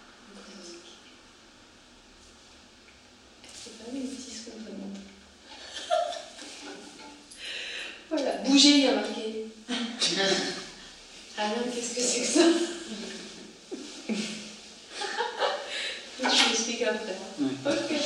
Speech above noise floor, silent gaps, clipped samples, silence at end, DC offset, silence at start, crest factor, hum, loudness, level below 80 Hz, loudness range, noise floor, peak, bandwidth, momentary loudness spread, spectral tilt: 32 dB; none; under 0.1%; 0 s; under 0.1%; 0 s; 24 dB; none; -27 LUFS; -68 dBFS; 18 LU; -54 dBFS; -6 dBFS; 12 kHz; 23 LU; -2 dB/octave